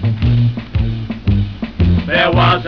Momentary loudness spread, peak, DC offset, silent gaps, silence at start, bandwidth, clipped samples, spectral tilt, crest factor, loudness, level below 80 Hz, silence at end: 9 LU; -6 dBFS; 0.7%; none; 0 s; 5.4 kHz; under 0.1%; -8.5 dB/octave; 10 dB; -15 LUFS; -24 dBFS; 0 s